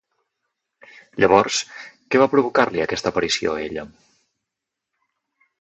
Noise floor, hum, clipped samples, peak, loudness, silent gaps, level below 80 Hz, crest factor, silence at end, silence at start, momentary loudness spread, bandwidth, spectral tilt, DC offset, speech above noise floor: -83 dBFS; none; under 0.1%; 0 dBFS; -19 LUFS; none; -54 dBFS; 22 dB; 1.75 s; 1.15 s; 17 LU; 8.4 kHz; -3.5 dB/octave; under 0.1%; 64 dB